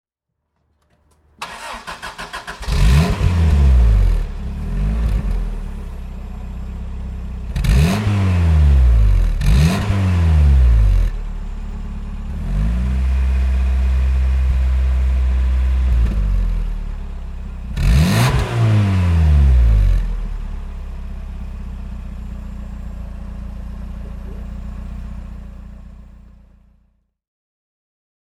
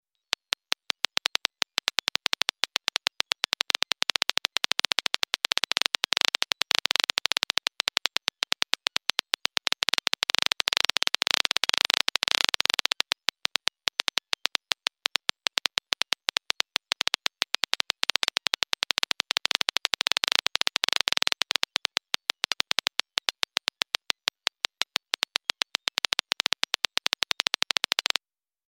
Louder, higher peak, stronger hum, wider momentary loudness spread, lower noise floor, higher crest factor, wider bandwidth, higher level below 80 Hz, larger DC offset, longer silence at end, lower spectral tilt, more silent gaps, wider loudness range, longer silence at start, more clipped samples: first, -17 LUFS vs -26 LUFS; about the same, -2 dBFS vs 0 dBFS; neither; first, 18 LU vs 4 LU; second, -76 dBFS vs -83 dBFS; second, 14 dB vs 28 dB; second, 13 kHz vs 17 kHz; first, -18 dBFS vs -88 dBFS; neither; first, 2.2 s vs 0.65 s; first, -6.5 dB/octave vs 3 dB/octave; neither; first, 16 LU vs 4 LU; second, 1.4 s vs 23.3 s; neither